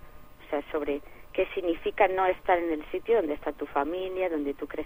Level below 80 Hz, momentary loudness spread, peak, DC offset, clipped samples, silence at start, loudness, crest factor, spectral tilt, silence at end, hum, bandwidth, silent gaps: -50 dBFS; 9 LU; -8 dBFS; under 0.1%; under 0.1%; 0 s; -29 LUFS; 22 dB; -6.5 dB/octave; 0 s; none; 15.5 kHz; none